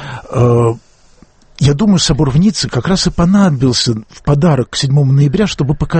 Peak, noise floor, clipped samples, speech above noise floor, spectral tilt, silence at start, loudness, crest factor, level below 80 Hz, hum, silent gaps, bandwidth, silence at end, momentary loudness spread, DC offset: 0 dBFS; -45 dBFS; under 0.1%; 34 dB; -6 dB/octave; 0 s; -12 LUFS; 12 dB; -30 dBFS; none; none; 8.8 kHz; 0 s; 6 LU; under 0.1%